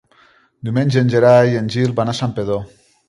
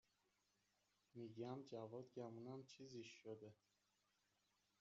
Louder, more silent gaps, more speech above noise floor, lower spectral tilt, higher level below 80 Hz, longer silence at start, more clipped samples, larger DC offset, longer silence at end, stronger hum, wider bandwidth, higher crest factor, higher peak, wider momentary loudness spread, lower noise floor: first, -16 LUFS vs -57 LUFS; neither; first, 38 dB vs 31 dB; about the same, -7 dB/octave vs -6 dB/octave; first, -50 dBFS vs under -90 dBFS; second, 0.65 s vs 1.15 s; neither; neither; second, 0.4 s vs 1.25 s; neither; first, 11 kHz vs 7.4 kHz; about the same, 16 dB vs 20 dB; first, 0 dBFS vs -38 dBFS; first, 12 LU vs 7 LU; second, -53 dBFS vs -87 dBFS